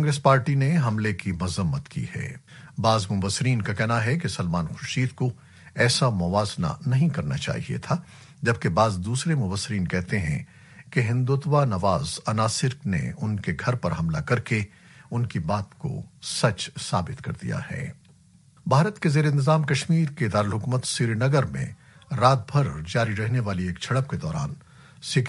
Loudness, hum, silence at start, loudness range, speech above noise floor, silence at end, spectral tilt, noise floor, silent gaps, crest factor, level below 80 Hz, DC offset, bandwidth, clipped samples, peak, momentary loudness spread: -25 LUFS; none; 0 s; 4 LU; 31 dB; 0 s; -5.5 dB/octave; -55 dBFS; none; 20 dB; -50 dBFS; under 0.1%; 11.5 kHz; under 0.1%; -4 dBFS; 12 LU